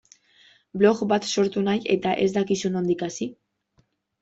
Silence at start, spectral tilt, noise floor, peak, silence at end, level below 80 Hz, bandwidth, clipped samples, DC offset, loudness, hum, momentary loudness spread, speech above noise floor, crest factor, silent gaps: 0.75 s; -5 dB/octave; -67 dBFS; -4 dBFS; 0.9 s; -64 dBFS; 8 kHz; under 0.1%; under 0.1%; -23 LUFS; none; 10 LU; 44 dB; 20 dB; none